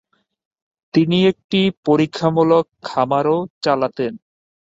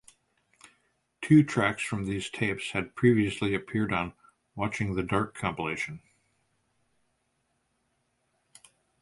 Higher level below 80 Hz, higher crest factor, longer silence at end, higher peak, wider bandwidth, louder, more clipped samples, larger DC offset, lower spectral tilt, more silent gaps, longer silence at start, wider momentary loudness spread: about the same, -60 dBFS vs -56 dBFS; second, 16 dB vs 22 dB; second, 0.6 s vs 3.05 s; first, -2 dBFS vs -8 dBFS; second, 7.8 kHz vs 11.5 kHz; first, -18 LUFS vs -28 LUFS; neither; neither; about the same, -7 dB/octave vs -6 dB/octave; first, 1.44-1.49 s, 1.77-1.83 s, 3.50-3.61 s vs none; second, 0.95 s vs 1.2 s; second, 7 LU vs 12 LU